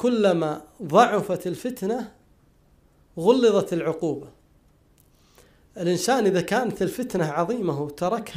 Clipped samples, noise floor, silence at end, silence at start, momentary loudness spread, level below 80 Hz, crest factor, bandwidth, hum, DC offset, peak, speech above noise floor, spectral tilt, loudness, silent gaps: under 0.1%; -59 dBFS; 0 s; 0 s; 11 LU; -60 dBFS; 22 dB; 15.5 kHz; none; under 0.1%; -2 dBFS; 36 dB; -5.5 dB/octave; -23 LUFS; none